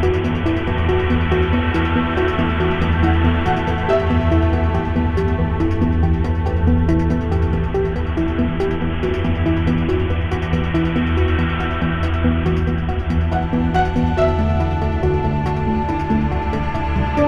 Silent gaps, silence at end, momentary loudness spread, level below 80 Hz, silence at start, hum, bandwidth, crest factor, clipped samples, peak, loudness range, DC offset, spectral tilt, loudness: none; 0 s; 4 LU; -26 dBFS; 0 s; none; 6.4 kHz; 14 dB; under 0.1%; -4 dBFS; 2 LU; 0.6%; -8.5 dB/octave; -19 LUFS